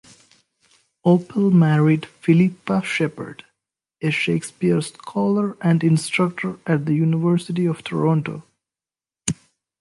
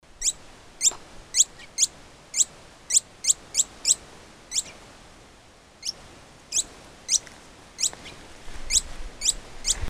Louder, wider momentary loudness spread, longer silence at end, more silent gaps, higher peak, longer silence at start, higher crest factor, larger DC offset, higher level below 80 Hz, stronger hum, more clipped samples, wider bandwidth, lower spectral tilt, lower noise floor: first, -20 LUFS vs -24 LUFS; second, 11 LU vs 21 LU; first, 0.45 s vs 0 s; neither; about the same, -2 dBFS vs -4 dBFS; first, 1.05 s vs 0.2 s; about the same, 20 dB vs 24 dB; neither; second, -60 dBFS vs -44 dBFS; neither; neither; second, 11.5 kHz vs 16 kHz; first, -6.5 dB/octave vs 1 dB/octave; first, under -90 dBFS vs -52 dBFS